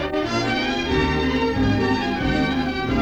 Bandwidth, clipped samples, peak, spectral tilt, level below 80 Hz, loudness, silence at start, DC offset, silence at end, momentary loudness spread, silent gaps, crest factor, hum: 8.8 kHz; under 0.1%; -8 dBFS; -6 dB/octave; -34 dBFS; -21 LUFS; 0 s; under 0.1%; 0 s; 2 LU; none; 12 dB; none